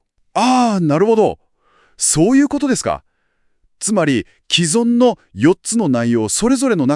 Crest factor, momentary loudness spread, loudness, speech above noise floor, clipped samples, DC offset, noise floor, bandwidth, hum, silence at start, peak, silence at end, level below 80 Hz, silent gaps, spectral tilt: 16 dB; 7 LU; -15 LUFS; 47 dB; under 0.1%; under 0.1%; -62 dBFS; 12 kHz; none; 0.35 s; 0 dBFS; 0 s; -48 dBFS; none; -4.5 dB/octave